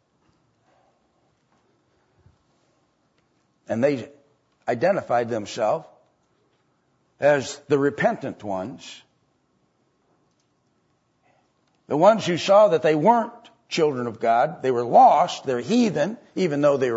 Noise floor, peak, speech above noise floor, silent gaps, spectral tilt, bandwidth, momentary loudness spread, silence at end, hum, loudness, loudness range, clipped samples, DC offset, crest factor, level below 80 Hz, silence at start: -68 dBFS; -4 dBFS; 47 dB; none; -5.5 dB/octave; 8 kHz; 15 LU; 0 s; none; -21 LUFS; 12 LU; under 0.1%; under 0.1%; 20 dB; -72 dBFS; 3.7 s